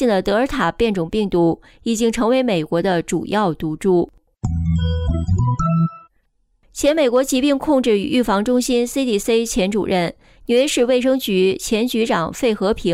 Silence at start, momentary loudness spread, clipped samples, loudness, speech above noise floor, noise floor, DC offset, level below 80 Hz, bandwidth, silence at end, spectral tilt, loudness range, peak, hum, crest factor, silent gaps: 0 s; 5 LU; under 0.1%; -18 LUFS; 45 dB; -63 dBFS; under 0.1%; -36 dBFS; 16 kHz; 0 s; -5.5 dB/octave; 3 LU; -6 dBFS; none; 12 dB; none